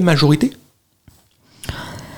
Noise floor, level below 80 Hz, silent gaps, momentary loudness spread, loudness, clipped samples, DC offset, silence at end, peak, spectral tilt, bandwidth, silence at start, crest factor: -55 dBFS; -44 dBFS; none; 18 LU; -17 LUFS; under 0.1%; under 0.1%; 0 s; -2 dBFS; -6 dB/octave; 17 kHz; 0 s; 18 dB